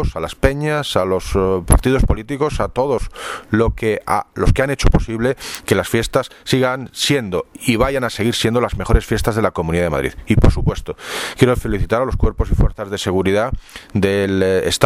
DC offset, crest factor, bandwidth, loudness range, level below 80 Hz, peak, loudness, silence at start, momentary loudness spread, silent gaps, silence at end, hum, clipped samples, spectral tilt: under 0.1%; 16 dB; 16 kHz; 1 LU; -24 dBFS; 0 dBFS; -18 LUFS; 0 s; 7 LU; none; 0 s; none; under 0.1%; -5.5 dB/octave